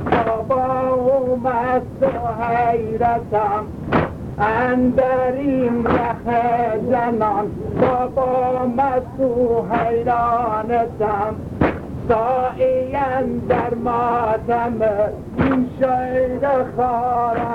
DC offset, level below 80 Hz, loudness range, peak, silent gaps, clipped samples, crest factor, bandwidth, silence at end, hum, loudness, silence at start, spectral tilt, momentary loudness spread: under 0.1%; -40 dBFS; 1 LU; -2 dBFS; none; under 0.1%; 16 dB; 6.8 kHz; 0 s; none; -19 LUFS; 0 s; -9 dB/octave; 3 LU